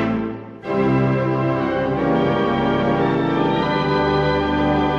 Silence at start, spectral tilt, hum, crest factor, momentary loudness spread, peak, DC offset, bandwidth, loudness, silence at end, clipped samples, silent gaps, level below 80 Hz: 0 s; -8 dB/octave; none; 12 dB; 4 LU; -6 dBFS; under 0.1%; 7.4 kHz; -19 LUFS; 0 s; under 0.1%; none; -38 dBFS